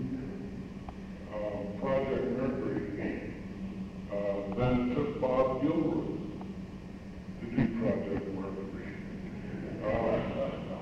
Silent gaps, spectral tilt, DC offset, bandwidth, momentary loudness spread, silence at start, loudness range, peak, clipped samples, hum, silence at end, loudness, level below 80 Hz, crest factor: none; -8.5 dB/octave; under 0.1%; 9 kHz; 13 LU; 0 s; 4 LU; -16 dBFS; under 0.1%; none; 0 s; -34 LUFS; -50 dBFS; 18 dB